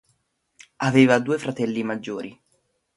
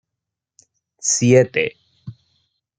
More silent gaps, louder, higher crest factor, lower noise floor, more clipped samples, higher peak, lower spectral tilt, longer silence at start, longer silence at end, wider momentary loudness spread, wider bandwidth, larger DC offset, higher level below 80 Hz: neither; second, -22 LUFS vs -17 LUFS; about the same, 22 dB vs 20 dB; second, -70 dBFS vs -83 dBFS; neither; about the same, -2 dBFS vs -2 dBFS; first, -6 dB/octave vs -4.5 dB/octave; second, 0.8 s vs 1.05 s; about the same, 0.65 s vs 0.7 s; second, 16 LU vs 26 LU; first, 11.5 kHz vs 9.6 kHz; neither; second, -66 dBFS vs -60 dBFS